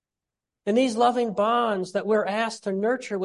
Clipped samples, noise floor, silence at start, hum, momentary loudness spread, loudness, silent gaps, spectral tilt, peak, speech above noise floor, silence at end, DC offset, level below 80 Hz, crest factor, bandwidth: under 0.1%; -88 dBFS; 0.65 s; none; 6 LU; -24 LUFS; none; -5 dB/octave; -8 dBFS; 65 dB; 0 s; under 0.1%; -74 dBFS; 16 dB; 11.5 kHz